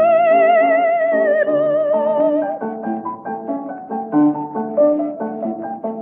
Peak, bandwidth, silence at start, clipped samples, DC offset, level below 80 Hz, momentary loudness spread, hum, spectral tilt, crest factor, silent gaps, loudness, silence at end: -4 dBFS; 3.6 kHz; 0 s; under 0.1%; under 0.1%; -72 dBFS; 13 LU; none; -10 dB/octave; 12 dB; none; -17 LUFS; 0 s